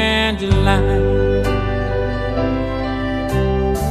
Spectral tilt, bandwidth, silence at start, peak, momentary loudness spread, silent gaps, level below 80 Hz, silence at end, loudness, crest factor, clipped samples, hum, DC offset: -6.5 dB/octave; 14 kHz; 0 s; -2 dBFS; 6 LU; none; -24 dBFS; 0 s; -18 LUFS; 16 dB; under 0.1%; none; under 0.1%